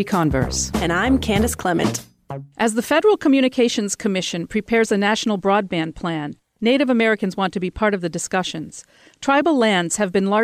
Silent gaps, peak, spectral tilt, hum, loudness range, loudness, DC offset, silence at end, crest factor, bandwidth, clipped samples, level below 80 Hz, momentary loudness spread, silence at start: none; -6 dBFS; -4.5 dB/octave; none; 2 LU; -19 LUFS; under 0.1%; 0 s; 14 dB; 15.5 kHz; under 0.1%; -40 dBFS; 11 LU; 0 s